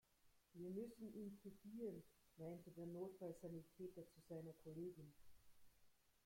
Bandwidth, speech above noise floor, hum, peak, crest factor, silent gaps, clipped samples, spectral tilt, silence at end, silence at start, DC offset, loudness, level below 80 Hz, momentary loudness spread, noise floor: 16.5 kHz; 22 dB; none; -40 dBFS; 16 dB; none; under 0.1%; -8 dB/octave; 0.15 s; 0.25 s; under 0.1%; -56 LUFS; -82 dBFS; 8 LU; -77 dBFS